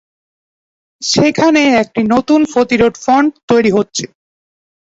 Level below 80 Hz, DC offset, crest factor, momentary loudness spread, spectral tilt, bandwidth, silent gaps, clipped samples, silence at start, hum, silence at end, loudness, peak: -46 dBFS; under 0.1%; 14 dB; 8 LU; -4.5 dB/octave; 8 kHz; 3.43-3.48 s; under 0.1%; 1 s; none; 0.9 s; -12 LUFS; 0 dBFS